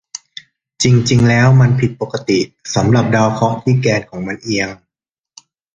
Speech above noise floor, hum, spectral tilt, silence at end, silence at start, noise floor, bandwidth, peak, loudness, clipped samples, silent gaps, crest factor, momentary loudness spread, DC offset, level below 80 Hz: 73 dB; none; -6 dB/octave; 1 s; 0.8 s; -86 dBFS; 9 kHz; 0 dBFS; -14 LUFS; under 0.1%; none; 14 dB; 14 LU; under 0.1%; -44 dBFS